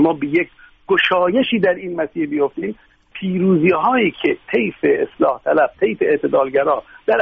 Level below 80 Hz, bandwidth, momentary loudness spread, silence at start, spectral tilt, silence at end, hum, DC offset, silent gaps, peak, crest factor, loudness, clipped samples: -56 dBFS; 5.4 kHz; 9 LU; 0 s; -4 dB/octave; 0 s; none; under 0.1%; none; -4 dBFS; 14 dB; -17 LUFS; under 0.1%